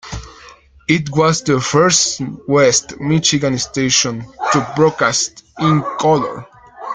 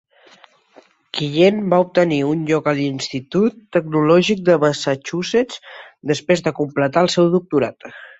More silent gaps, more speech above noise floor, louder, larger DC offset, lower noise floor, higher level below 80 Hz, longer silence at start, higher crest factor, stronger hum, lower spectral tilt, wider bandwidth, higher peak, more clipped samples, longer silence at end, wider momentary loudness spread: neither; second, 27 dB vs 34 dB; first, -15 LUFS vs -18 LUFS; neither; second, -43 dBFS vs -51 dBFS; first, -44 dBFS vs -58 dBFS; second, 0.05 s vs 1.15 s; about the same, 16 dB vs 16 dB; neither; second, -3.5 dB/octave vs -6 dB/octave; first, 10 kHz vs 8.2 kHz; about the same, 0 dBFS vs -2 dBFS; neither; second, 0 s vs 0.15 s; about the same, 12 LU vs 10 LU